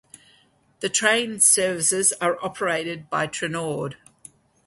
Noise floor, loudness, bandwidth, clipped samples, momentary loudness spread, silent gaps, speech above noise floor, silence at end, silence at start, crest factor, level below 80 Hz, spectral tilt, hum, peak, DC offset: -60 dBFS; -21 LUFS; 12 kHz; under 0.1%; 12 LU; none; 37 dB; 0.7 s; 0.8 s; 22 dB; -66 dBFS; -2 dB/octave; none; -2 dBFS; under 0.1%